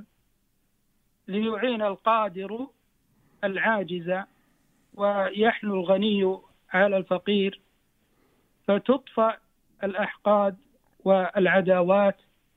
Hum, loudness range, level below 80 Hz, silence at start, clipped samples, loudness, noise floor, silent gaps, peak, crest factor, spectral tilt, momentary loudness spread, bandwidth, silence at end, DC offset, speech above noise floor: none; 5 LU; -68 dBFS; 1.3 s; under 0.1%; -25 LUFS; -70 dBFS; none; -8 dBFS; 18 dB; -8 dB/octave; 12 LU; 4.1 kHz; 0.45 s; under 0.1%; 46 dB